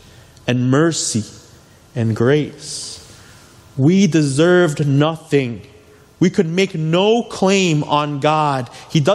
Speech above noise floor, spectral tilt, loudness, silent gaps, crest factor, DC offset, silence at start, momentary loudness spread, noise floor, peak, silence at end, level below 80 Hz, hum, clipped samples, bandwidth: 30 dB; -5.5 dB/octave; -17 LUFS; none; 16 dB; under 0.1%; 0.45 s; 13 LU; -46 dBFS; -2 dBFS; 0 s; -56 dBFS; none; under 0.1%; 12.5 kHz